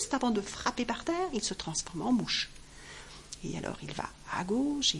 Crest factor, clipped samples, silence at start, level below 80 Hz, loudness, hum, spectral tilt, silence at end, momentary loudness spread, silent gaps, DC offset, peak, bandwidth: 20 dB; under 0.1%; 0 s; -54 dBFS; -33 LUFS; none; -3 dB/octave; 0 s; 17 LU; none; under 0.1%; -14 dBFS; 11.5 kHz